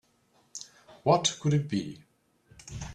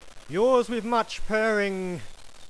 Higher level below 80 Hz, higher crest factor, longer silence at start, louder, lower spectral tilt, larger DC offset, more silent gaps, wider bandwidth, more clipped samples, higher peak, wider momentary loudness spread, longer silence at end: second, -56 dBFS vs -44 dBFS; first, 24 dB vs 16 dB; first, 0.55 s vs 0 s; about the same, -27 LUFS vs -25 LUFS; about the same, -5 dB/octave vs -5 dB/octave; second, under 0.1% vs 0.5%; neither; about the same, 10.5 kHz vs 11 kHz; neither; about the same, -8 dBFS vs -10 dBFS; first, 24 LU vs 11 LU; about the same, 0 s vs 0.05 s